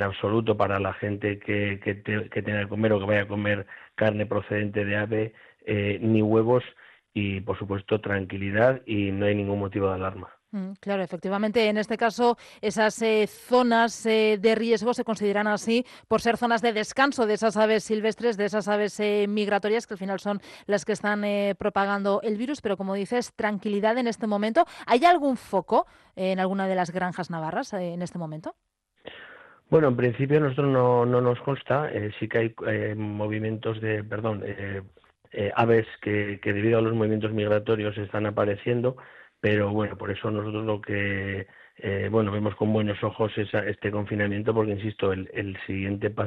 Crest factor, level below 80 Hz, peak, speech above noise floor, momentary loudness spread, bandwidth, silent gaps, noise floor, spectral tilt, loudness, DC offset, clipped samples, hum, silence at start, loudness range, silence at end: 18 dB; -62 dBFS; -6 dBFS; 23 dB; 9 LU; 12.5 kHz; none; -49 dBFS; -6.5 dB/octave; -26 LUFS; under 0.1%; under 0.1%; none; 0 s; 4 LU; 0 s